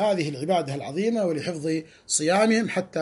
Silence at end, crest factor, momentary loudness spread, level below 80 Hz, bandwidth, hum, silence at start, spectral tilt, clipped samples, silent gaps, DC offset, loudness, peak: 0 s; 16 dB; 8 LU; -68 dBFS; 11.5 kHz; none; 0 s; -4.5 dB/octave; under 0.1%; none; under 0.1%; -25 LUFS; -10 dBFS